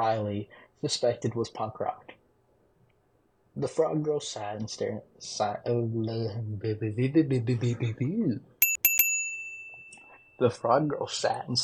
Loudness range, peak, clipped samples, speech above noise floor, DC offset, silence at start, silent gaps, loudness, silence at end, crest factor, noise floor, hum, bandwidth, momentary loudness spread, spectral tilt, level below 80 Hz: 8 LU; -10 dBFS; under 0.1%; 39 dB; under 0.1%; 0 s; none; -28 LUFS; 0 s; 20 dB; -68 dBFS; none; 19 kHz; 13 LU; -4.5 dB/octave; -68 dBFS